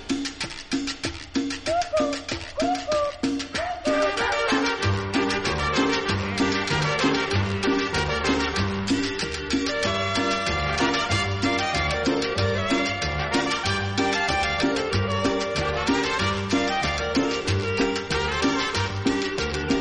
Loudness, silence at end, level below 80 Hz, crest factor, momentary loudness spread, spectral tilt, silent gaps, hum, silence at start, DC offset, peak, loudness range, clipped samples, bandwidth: -24 LUFS; 0 s; -40 dBFS; 16 dB; 5 LU; -4.5 dB/octave; none; none; 0 s; under 0.1%; -10 dBFS; 2 LU; under 0.1%; 11.5 kHz